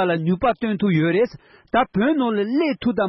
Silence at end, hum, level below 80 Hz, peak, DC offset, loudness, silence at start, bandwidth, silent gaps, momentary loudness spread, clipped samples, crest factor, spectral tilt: 0 s; none; -50 dBFS; -8 dBFS; under 0.1%; -20 LUFS; 0 s; 6 kHz; none; 3 LU; under 0.1%; 12 dB; -9.5 dB/octave